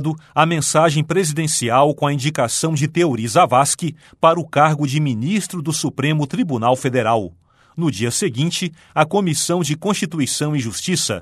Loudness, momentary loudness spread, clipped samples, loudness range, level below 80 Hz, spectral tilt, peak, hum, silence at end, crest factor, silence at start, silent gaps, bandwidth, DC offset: -18 LUFS; 6 LU; under 0.1%; 3 LU; -58 dBFS; -4.5 dB/octave; 0 dBFS; none; 0 s; 18 dB; 0 s; none; 13.5 kHz; under 0.1%